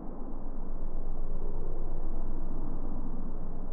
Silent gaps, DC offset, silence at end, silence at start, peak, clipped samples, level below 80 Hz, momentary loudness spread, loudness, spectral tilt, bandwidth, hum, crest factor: none; under 0.1%; 0 s; 0 s; -20 dBFS; under 0.1%; -30 dBFS; 3 LU; -41 LUFS; -11 dB/octave; 1.5 kHz; none; 8 dB